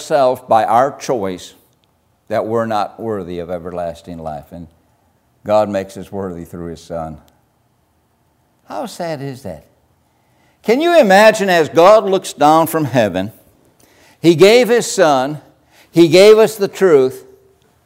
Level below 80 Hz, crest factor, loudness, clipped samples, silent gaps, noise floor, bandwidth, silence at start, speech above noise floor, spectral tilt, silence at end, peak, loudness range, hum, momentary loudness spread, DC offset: -54 dBFS; 14 dB; -13 LUFS; under 0.1%; none; -59 dBFS; 16 kHz; 0 s; 46 dB; -5 dB/octave; 0.65 s; 0 dBFS; 17 LU; none; 20 LU; under 0.1%